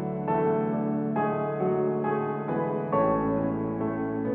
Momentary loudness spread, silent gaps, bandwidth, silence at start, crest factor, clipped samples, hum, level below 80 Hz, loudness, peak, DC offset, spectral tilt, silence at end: 4 LU; none; 3.7 kHz; 0 s; 14 dB; under 0.1%; none; -54 dBFS; -27 LUFS; -12 dBFS; under 0.1%; -12 dB/octave; 0 s